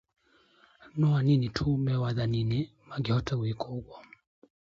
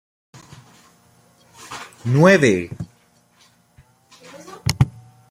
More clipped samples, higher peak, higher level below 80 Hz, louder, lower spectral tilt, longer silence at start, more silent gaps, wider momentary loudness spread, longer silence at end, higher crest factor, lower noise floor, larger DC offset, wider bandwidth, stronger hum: neither; second, -16 dBFS vs -2 dBFS; about the same, -52 dBFS vs -48 dBFS; second, -29 LUFS vs -18 LUFS; first, -8 dB/octave vs -6 dB/octave; second, 0.95 s vs 1.7 s; neither; second, 12 LU vs 24 LU; first, 0.7 s vs 0.4 s; second, 14 dB vs 20 dB; first, -63 dBFS vs -57 dBFS; neither; second, 7.4 kHz vs 16 kHz; neither